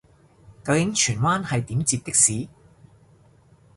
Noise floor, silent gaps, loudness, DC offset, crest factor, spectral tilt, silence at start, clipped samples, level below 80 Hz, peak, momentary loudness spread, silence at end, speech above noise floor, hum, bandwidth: -55 dBFS; none; -21 LUFS; under 0.1%; 20 dB; -3.5 dB/octave; 0.5 s; under 0.1%; -54 dBFS; -4 dBFS; 14 LU; 1.3 s; 33 dB; none; 11.5 kHz